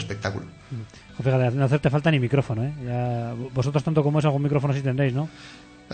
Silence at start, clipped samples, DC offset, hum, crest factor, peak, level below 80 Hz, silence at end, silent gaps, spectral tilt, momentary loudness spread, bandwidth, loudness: 0 s; under 0.1%; under 0.1%; none; 18 dB; -4 dBFS; -52 dBFS; 0 s; none; -7.5 dB/octave; 16 LU; 9 kHz; -24 LUFS